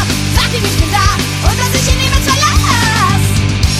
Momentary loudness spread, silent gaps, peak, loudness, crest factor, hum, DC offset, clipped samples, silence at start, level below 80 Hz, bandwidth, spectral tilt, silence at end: 3 LU; none; 0 dBFS; -11 LUFS; 12 dB; none; under 0.1%; under 0.1%; 0 s; -18 dBFS; 16 kHz; -3.5 dB/octave; 0 s